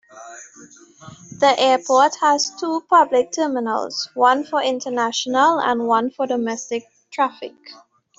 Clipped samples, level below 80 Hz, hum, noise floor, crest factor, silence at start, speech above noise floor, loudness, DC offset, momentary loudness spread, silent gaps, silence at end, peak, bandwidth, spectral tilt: under 0.1%; -70 dBFS; none; -46 dBFS; 18 dB; 0.15 s; 27 dB; -19 LUFS; under 0.1%; 18 LU; none; 0.45 s; -2 dBFS; 8 kHz; -2.5 dB/octave